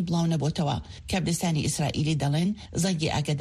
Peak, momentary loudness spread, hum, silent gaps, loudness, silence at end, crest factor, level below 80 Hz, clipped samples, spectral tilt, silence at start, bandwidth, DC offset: -14 dBFS; 4 LU; none; none; -27 LUFS; 0 s; 12 dB; -46 dBFS; under 0.1%; -5.5 dB/octave; 0 s; 13 kHz; under 0.1%